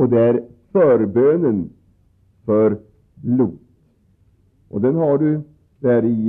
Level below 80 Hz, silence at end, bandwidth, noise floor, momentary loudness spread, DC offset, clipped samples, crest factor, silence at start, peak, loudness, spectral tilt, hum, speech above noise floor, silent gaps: -58 dBFS; 0 s; 3.7 kHz; -57 dBFS; 14 LU; under 0.1%; under 0.1%; 12 dB; 0 s; -6 dBFS; -18 LUFS; -12.5 dB/octave; none; 41 dB; none